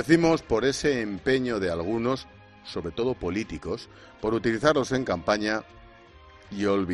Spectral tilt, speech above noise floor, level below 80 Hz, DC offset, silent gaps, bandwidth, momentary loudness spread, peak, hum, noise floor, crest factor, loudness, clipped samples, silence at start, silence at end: -5.5 dB/octave; 25 dB; -50 dBFS; under 0.1%; none; 11.5 kHz; 12 LU; -6 dBFS; none; -51 dBFS; 22 dB; -26 LUFS; under 0.1%; 0 s; 0 s